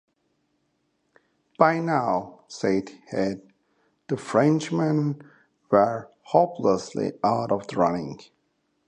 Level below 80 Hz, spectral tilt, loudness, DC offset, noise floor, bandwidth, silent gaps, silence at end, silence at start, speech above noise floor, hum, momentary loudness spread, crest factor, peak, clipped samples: -64 dBFS; -7 dB/octave; -24 LUFS; under 0.1%; -72 dBFS; 10.5 kHz; none; 0.65 s; 1.6 s; 49 dB; none; 12 LU; 24 dB; -2 dBFS; under 0.1%